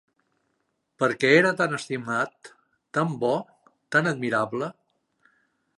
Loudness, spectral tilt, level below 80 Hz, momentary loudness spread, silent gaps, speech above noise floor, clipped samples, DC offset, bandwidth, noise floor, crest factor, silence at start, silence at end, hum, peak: -24 LUFS; -5.5 dB/octave; -76 dBFS; 12 LU; none; 51 dB; under 0.1%; under 0.1%; 11.5 kHz; -75 dBFS; 24 dB; 1 s; 1.05 s; none; -4 dBFS